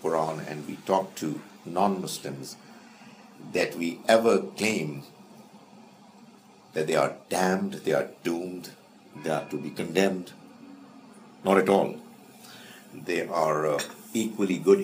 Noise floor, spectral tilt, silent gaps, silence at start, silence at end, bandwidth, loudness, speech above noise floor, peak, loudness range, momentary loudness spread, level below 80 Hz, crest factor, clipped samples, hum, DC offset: -53 dBFS; -5 dB/octave; none; 0 s; 0 s; 15.5 kHz; -27 LUFS; 27 dB; -4 dBFS; 4 LU; 23 LU; -76 dBFS; 24 dB; under 0.1%; none; under 0.1%